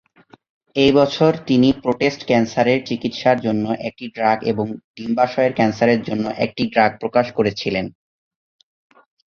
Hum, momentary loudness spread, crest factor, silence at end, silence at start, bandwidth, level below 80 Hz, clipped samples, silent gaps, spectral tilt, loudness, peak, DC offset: none; 9 LU; 18 dB; 1.35 s; 0.75 s; 7.2 kHz; -54 dBFS; under 0.1%; 4.84-4.94 s; -6.5 dB/octave; -18 LUFS; -2 dBFS; under 0.1%